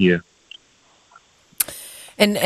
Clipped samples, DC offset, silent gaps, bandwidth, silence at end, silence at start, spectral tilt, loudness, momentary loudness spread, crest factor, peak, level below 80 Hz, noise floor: under 0.1%; under 0.1%; none; 14 kHz; 0 s; 0 s; -4 dB/octave; -22 LUFS; 24 LU; 22 dB; 0 dBFS; -60 dBFS; -57 dBFS